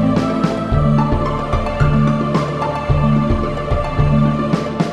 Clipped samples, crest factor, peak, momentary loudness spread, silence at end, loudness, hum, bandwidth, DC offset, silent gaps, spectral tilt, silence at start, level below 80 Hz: under 0.1%; 14 dB; -2 dBFS; 5 LU; 0 s; -17 LUFS; none; 9.2 kHz; under 0.1%; none; -8 dB/octave; 0 s; -24 dBFS